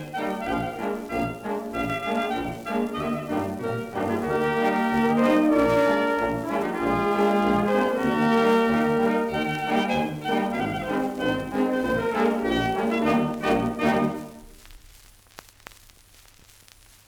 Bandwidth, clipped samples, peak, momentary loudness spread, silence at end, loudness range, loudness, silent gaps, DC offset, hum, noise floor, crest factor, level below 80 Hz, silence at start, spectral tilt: over 20 kHz; under 0.1%; -10 dBFS; 9 LU; 2.3 s; 6 LU; -24 LUFS; none; under 0.1%; none; -53 dBFS; 14 dB; -50 dBFS; 0 s; -6 dB/octave